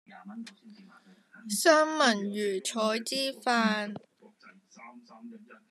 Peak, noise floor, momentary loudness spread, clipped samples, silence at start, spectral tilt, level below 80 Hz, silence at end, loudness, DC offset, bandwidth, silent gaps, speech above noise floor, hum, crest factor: -8 dBFS; -58 dBFS; 26 LU; under 0.1%; 0.1 s; -3 dB/octave; under -90 dBFS; 0.15 s; -27 LUFS; under 0.1%; 14 kHz; none; 28 dB; none; 24 dB